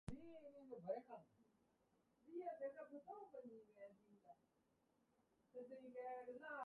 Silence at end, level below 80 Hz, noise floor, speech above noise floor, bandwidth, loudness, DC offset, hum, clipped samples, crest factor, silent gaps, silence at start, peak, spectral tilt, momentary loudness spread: 0 s; -76 dBFS; -84 dBFS; 27 dB; 4.5 kHz; -56 LUFS; under 0.1%; none; under 0.1%; 20 dB; none; 0.05 s; -36 dBFS; -6 dB/octave; 12 LU